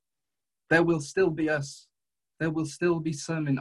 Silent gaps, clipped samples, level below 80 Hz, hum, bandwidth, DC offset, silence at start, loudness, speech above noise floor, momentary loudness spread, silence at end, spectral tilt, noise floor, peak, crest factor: none; under 0.1%; -62 dBFS; none; 11.5 kHz; under 0.1%; 0.7 s; -27 LUFS; over 63 dB; 9 LU; 0 s; -6 dB/octave; under -90 dBFS; -10 dBFS; 20 dB